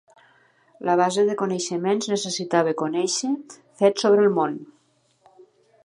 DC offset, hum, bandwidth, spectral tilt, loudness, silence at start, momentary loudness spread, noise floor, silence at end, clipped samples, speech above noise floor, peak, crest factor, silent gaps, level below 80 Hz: under 0.1%; none; 11 kHz; -4 dB/octave; -22 LUFS; 0.8 s; 9 LU; -64 dBFS; 1.2 s; under 0.1%; 42 dB; -6 dBFS; 18 dB; none; -78 dBFS